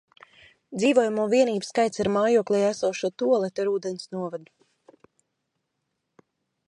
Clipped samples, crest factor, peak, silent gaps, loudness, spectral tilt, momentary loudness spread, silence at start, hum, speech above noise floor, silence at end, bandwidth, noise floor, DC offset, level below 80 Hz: under 0.1%; 20 dB; -6 dBFS; none; -24 LUFS; -5 dB/octave; 12 LU; 0.7 s; none; 56 dB; 2.25 s; 11 kHz; -79 dBFS; under 0.1%; -68 dBFS